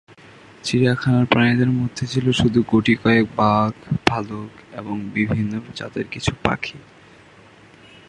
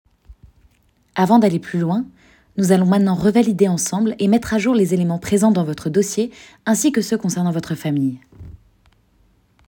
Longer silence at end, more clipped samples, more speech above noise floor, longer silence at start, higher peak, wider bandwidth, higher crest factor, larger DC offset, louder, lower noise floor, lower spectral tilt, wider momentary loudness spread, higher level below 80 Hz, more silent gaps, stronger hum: first, 1.3 s vs 1.15 s; neither; second, 28 dB vs 42 dB; first, 0.65 s vs 0.3 s; about the same, 0 dBFS vs 0 dBFS; second, 11 kHz vs 18.5 kHz; about the same, 20 dB vs 18 dB; neither; about the same, -20 LUFS vs -18 LUFS; second, -47 dBFS vs -59 dBFS; about the same, -6 dB/octave vs -6 dB/octave; first, 13 LU vs 9 LU; about the same, -46 dBFS vs -50 dBFS; neither; neither